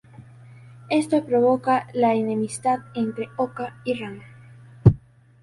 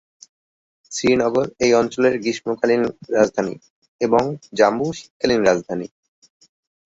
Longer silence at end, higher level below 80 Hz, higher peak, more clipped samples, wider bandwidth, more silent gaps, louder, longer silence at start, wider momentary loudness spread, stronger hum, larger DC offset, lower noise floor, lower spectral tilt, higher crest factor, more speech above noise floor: second, 0.45 s vs 1 s; first, -46 dBFS vs -56 dBFS; about the same, 0 dBFS vs -2 dBFS; neither; first, 11.5 kHz vs 8 kHz; second, none vs 3.70-3.82 s, 3.88-3.99 s, 5.10-5.20 s; second, -23 LUFS vs -20 LUFS; second, 0.2 s vs 0.9 s; about the same, 11 LU vs 11 LU; neither; neither; second, -46 dBFS vs under -90 dBFS; first, -7 dB/octave vs -4.5 dB/octave; about the same, 22 dB vs 18 dB; second, 23 dB vs over 71 dB